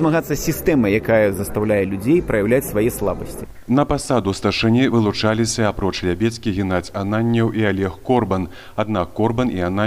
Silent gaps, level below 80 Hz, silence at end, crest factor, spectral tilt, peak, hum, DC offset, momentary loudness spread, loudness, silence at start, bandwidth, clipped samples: none; -38 dBFS; 0 s; 14 dB; -6 dB/octave; -4 dBFS; none; under 0.1%; 6 LU; -19 LUFS; 0 s; 15.5 kHz; under 0.1%